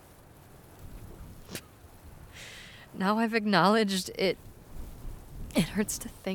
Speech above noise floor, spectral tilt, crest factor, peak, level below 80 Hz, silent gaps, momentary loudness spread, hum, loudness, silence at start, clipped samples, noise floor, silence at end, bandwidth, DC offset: 26 dB; -4.5 dB/octave; 24 dB; -8 dBFS; -50 dBFS; none; 25 LU; none; -28 LUFS; 0.55 s; under 0.1%; -53 dBFS; 0 s; 19 kHz; under 0.1%